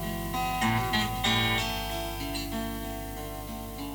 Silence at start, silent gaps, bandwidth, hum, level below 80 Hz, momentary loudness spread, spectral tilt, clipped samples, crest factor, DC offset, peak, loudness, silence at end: 0 s; none; over 20 kHz; 50 Hz at -40 dBFS; -42 dBFS; 12 LU; -4 dB/octave; under 0.1%; 18 dB; under 0.1%; -14 dBFS; -30 LUFS; 0 s